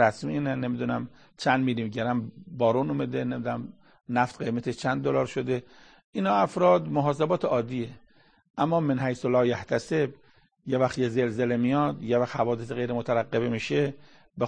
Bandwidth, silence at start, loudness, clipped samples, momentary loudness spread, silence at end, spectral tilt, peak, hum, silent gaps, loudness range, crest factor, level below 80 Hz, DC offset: 9.8 kHz; 0 s; -27 LUFS; under 0.1%; 8 LU; 0 s; -7 dB/octave; -6 dBFS; none; 6.04-6.13 s, 8.50-8.54 s; 3 LU; 20 dB; -62 dBFS; under 0.1%